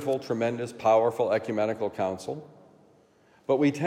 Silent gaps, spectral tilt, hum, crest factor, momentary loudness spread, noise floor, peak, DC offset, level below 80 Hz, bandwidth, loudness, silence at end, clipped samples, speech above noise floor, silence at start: none; -6.5 dB/octave; none; 16 dB; 14 LU; -61 dBFS; -12 dBFS; under 0.1%; -74 dBFS; 15.5 kHz; -27 LUFS; 0 s; under 0.1%; 34 dB; 0 s